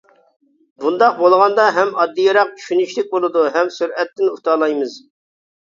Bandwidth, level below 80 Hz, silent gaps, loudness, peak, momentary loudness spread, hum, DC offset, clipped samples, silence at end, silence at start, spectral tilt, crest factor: 7.6 kHz; -70 dBFS; none; -16 LUFS; 0 dBFS; 9 LU; none; under 0.1%; under 0.1%; 0.6 s; 0.8 s; -4 dB/octave; 16 dB